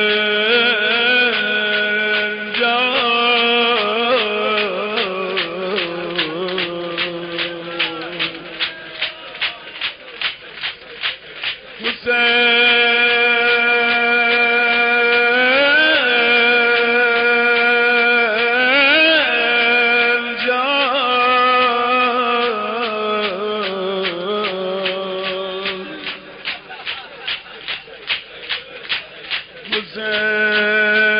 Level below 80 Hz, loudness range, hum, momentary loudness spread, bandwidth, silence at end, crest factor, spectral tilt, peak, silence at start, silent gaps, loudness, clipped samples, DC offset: -58 dBFS; 11 LU; none; 13 LU; 5.2 kHz; 0 s; 12 dB; 1 dB/octave; -4 dBFS; 0 s; none; -16 LUFS; under 0.1%; under 0.1%